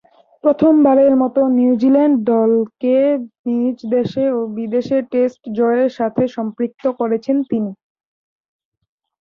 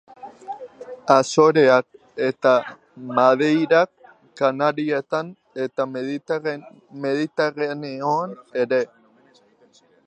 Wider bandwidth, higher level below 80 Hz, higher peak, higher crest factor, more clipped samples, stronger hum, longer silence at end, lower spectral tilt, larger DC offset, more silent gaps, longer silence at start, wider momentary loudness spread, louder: second, 6.4 kHz vs 9.4 kHz; first, -60 dBFS vs -76 dBFS; about the same, -2 dBFS vs 0 dBFS; second, 14 dB vs 20 dB; neither; neither; first, 1.45 s vs 1.2 s; first, -8.5 dB/octave vs -5.5 dB/octave; neither; first, 3.39-3.44 s vs none; first, 0.45 s vs 0.2 s; second, 9 LU vs 19 LU; first, -16 LUFS vs -21 LUFS